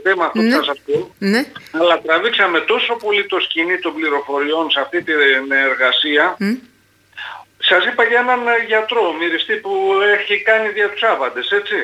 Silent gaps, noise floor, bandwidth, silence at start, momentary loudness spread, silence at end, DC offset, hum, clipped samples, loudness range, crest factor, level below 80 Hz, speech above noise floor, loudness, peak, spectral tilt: none; -43 dBFS; 14.5 kHz; 0 s; 6 LU; 0 s; under 0.1%; none; under 0.1%; 1 LU; 14 dB; -68 dBFS; 27 dB; -15 LUFS; -2 dBFS; -4.5 dB/octave